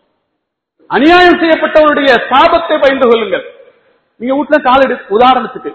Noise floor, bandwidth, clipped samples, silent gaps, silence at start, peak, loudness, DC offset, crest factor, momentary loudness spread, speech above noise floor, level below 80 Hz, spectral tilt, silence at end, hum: -71 dBFS; 8 kHz; 0.8%; none; 0.9 s; 0 dBFS; -9 LUFS; under 0.1%; 10 dB; 10 LU; 62 dB; -42 dBFS; -5.5 dB/octave; 0 s; none